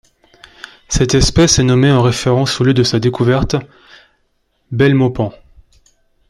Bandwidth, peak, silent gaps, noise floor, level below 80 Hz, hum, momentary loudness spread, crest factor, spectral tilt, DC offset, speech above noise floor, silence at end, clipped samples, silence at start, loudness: 12.5 kHz; 0 dBFS; none; -62 dBFS; -30 dBFS; none; 10 LU; 14 dB; -5 dB/octave; under 0.1%; 50 dB; 1 s; under 0.1%; 0.9 s; -13 LUFS